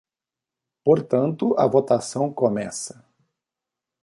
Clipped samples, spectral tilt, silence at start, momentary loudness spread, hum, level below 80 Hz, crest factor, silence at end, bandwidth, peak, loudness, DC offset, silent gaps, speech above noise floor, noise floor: under 0.1%; -6.5 dB/octave; 0.85 s; 11 LU; none; -66 dBFS; 18 dB; 1.15 s; 11.5 kHz; -4 dBFS; -22 LUFS; under 0.1%; none; 68 dB; -89 dBFS